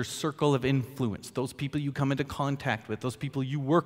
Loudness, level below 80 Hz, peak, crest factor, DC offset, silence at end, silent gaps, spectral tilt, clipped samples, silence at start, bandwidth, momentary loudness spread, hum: -30 LUFS; -58 dBFS; -10 dBFS; 18 dB; under 0.1%; 0 s; none; -6 dB/octave; under 0.1%; 0 s; 16 kHz; 7 LU; none